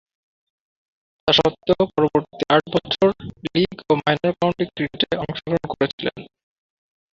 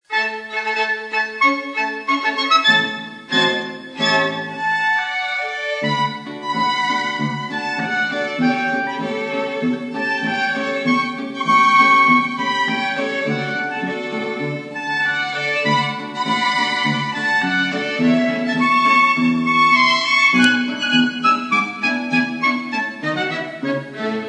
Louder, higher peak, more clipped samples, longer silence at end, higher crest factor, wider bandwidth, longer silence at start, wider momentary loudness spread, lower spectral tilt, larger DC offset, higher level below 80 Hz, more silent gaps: second, -21 LUFS vs -18 LUFS; about the same, -2 dBFS vs -2 dBFS; neither; first, 0.85 s vs 0 s; about the same, 20 dB vs 16 dB; second, 7.6 kHz vs 10.5 kHz; first, 1.25 s vs 0.1 s; second, 8 LU vs 11 LU; first, -6 dB/octave vs -4 dB/octave; neither; first, -50 dBFS vs -70 dBFS; first, 5.93-5.98 s vs none